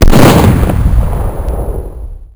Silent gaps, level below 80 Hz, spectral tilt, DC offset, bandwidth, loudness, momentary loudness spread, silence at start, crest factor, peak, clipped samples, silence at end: none; -12 dBFS; -6.5 dB/octave; under 0.1%; over 20 kHz; -10 LUFS; 18 LU; 0 s; 8 dB; 0 dBFS; 8%; 0 s